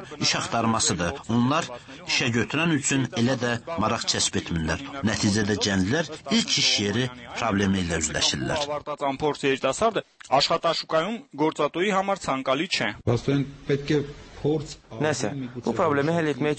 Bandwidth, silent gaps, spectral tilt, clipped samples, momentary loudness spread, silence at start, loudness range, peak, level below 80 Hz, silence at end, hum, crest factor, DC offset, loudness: 8.8 kHz; none; -4 dB/octave; under 0.1%; 6 LU; 0 s; 3 LU; -8 dBFS; -50 dBFS; 0 s; none; 16 dB; under 0.1%; -24 LUFS